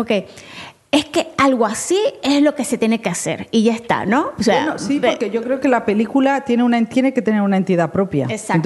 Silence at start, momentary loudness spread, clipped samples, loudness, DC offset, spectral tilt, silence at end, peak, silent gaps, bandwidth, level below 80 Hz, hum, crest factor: 0 s; 5 LU; under 0.1%; -17 LUFS; under 0.1%; -5 dB/octave; 0 s; -2 dBFS; none; 12 kHz; -54 dBFS; none; 16 dB